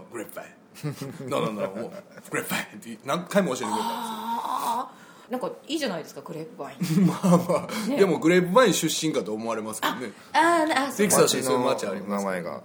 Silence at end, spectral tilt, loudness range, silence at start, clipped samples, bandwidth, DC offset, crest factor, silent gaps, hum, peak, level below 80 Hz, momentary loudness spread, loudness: 0 s; -4.5 dB/octave; 8 LU; 0 s; under 0.1%; over 20 kHz; under 0.1%; 20 dB; none; none; -6 dBFS; -70 dBFS; 18 LU; -25 LUFS